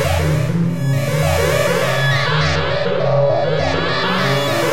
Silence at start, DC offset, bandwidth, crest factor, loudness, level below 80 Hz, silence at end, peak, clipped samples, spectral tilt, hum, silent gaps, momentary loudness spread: 0 s; 4%; 16 kHz; 12 dB; -16 LUFS; -36 dBFS; 0 s; -4 dBFS; under 0.1%; -5.5 dB/octave; none; none; 2 LU